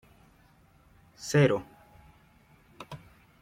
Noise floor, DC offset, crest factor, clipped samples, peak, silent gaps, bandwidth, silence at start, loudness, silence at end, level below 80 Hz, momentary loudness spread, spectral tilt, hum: -61 dBFS; under 0.1%; 22 dB; under 0.1%; -12 dBFS; none; 15 kHz; 1.2 s; -27 LUFS; 0.45 s; -64 dBFS; 26 LU; -6 dB/octave; none